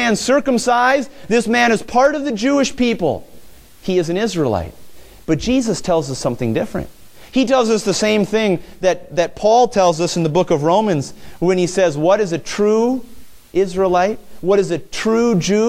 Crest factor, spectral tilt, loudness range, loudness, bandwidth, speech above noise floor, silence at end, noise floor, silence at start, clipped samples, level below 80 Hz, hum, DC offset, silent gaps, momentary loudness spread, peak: 16 dB; -5 dB/octave; 4 LU; -17 LUFS; 16 kHz; 23 dB; 0 s; -39 dBFS; 0 s; under 0.1%; -44 dBFS; none; under 0.1%; none; 8 LU; -2 dBFS